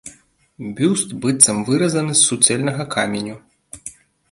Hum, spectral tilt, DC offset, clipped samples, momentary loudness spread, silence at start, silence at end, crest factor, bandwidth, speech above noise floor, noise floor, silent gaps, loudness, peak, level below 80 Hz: none; -3 dB/octave; under 0.1%; under 0.1%; 21 LU; 0.05 s; 0.4 s; 20 dB; 16 kHz; 34 dB; -51 dBFS; none; -16 LUFS; 0 dBFS; -58 dBFS